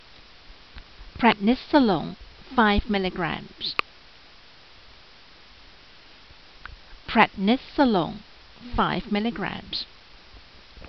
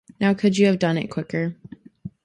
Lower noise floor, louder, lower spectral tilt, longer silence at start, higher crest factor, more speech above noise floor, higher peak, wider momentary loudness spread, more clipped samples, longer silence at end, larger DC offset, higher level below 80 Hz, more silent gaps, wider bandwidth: first, -51 dBFS vs -41 dBFS; second, -24 LUFS vs -21 LUFS; second, -3.5 dB/octave vs -6.5 dB/octave; first, 0.5 s vs 0.2 s; first, 24 dB vs 18 dB; first, 28 dB vs 20 dB; about the same, -4 dBFS vs -6 dBFS; about the same, 24 LU vs 22 LU; neither; second, 0 s vs 0.15 s; first, 0.2% vs under 0.1%; first, -42 dBFS vs -60 dBFS; neither; second, 6.2 kHz vs 10.5 kHz